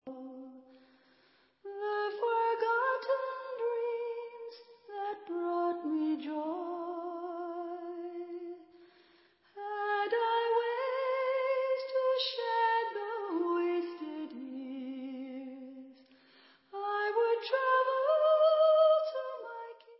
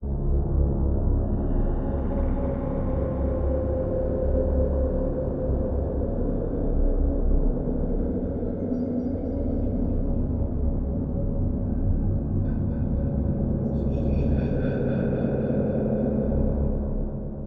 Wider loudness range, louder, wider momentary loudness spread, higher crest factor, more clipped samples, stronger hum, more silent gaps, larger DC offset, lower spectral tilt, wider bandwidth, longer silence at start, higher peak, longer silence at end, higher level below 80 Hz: first, 11 LU vs 2 LU; second, -32 LUFS vs -27 LUFS; first, 18 LU vs 3 LU; about the same, 18 dB vs 14 dB; neither; neither; neither; neither; second, 1 dB/octave vs -13 dB/octave; first, 5.6 kHz vs 3.7 kHz; about the same, 0.05 s vs 0 s; second, -16 dBFS vs -10 dBFS; about the same, 0.05 s vs 0 s; second, under -90 dBFS vs -28 dBFS